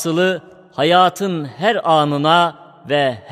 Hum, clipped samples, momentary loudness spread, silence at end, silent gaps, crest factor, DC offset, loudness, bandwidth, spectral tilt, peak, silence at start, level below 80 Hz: none; under 0.1%; 9 LU; 0 s; none; 16 dB; under 0.1%; -16 LUFS; 15.5 kHz; -5 dB/octave; 0 dBFS; 0 s; -64 dBFS